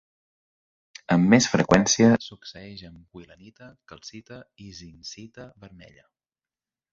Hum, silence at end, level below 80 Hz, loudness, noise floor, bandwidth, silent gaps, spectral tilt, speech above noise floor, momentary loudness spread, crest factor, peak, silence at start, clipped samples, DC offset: none; 1.45 s; -56 dBFS; -20 LUFS; under -90 dBFS; 7.8 kHz; none; -4.5 dB/octave; over 65 dB; 25 LU; 24 dB; -2 dBFS; 1.1 s; under 0.1%; under 0.1%